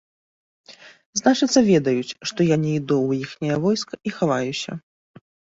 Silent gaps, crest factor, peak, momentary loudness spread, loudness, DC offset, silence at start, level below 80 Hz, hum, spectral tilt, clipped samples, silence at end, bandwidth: 1.06-1.13 s; 20 dB; -4 dBFS; 12 LU; -21 LUFS; under 0.1%; 0.7 s; -60 dBFS; none; -5 dB/octave; under 0.1%; 0.8 s; 8 kHz